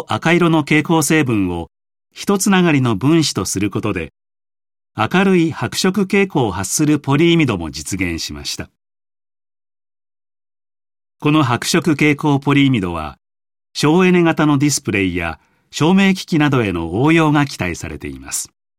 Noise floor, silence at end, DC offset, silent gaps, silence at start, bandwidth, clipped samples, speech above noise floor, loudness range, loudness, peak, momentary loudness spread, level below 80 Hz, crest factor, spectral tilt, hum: under -90 dBFS; 0.3 s; under 0.1%; none; 0 s; 16 kHz; under 0.1%; over 75 dB; 6 LU; -16 LUFS; 0 dBFS; 12 LU; -44 dBFS; 16 dB; -5 dB/octave; none